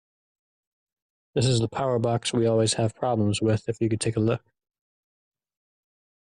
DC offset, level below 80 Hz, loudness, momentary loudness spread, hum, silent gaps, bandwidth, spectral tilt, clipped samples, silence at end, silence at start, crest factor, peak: under 0.1%; -58 dBFS; -25 LUFS; 4 LU; none; none; 11 kHz; -5.5 dB/octave; under 0.1%; 1.9 s; 1.35 s; 14 dB; -12 dBFS